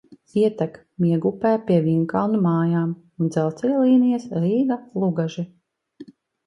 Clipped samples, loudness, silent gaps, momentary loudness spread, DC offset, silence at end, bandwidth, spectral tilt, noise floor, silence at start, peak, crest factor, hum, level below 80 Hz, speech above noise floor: under 0.1%; -21 LUFS; none; 10 LU; under 0.1%; 0.45 s; 10 kHz; -9 dB/octave; -46 dBFS; 0.1 s; -6 dBFS; 16 dB; none; -64 dBFS; 26 dB